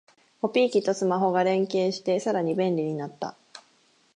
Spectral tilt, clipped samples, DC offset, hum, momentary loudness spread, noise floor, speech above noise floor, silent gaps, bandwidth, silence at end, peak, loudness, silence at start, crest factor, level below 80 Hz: -6 dB/octave; under 0.1%; under 0.1%; none; 10 LU; -63 dBFS; 39 dB; none; 10.5 kHz; 0.55 s; -10 dBFS; -25 LUFS; 0.45 s; 16 dB; -80 dBFS